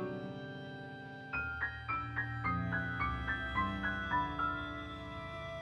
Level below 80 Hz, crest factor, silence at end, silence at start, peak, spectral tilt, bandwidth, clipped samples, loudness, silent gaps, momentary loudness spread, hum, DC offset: -52 dBFS; 18 dB; 0 s; 0 s; -22 dBFS; -7 dB/octave; 10 kHz; under 0.1%; -38 LUFS; none; 10 LU; none; under 0.1%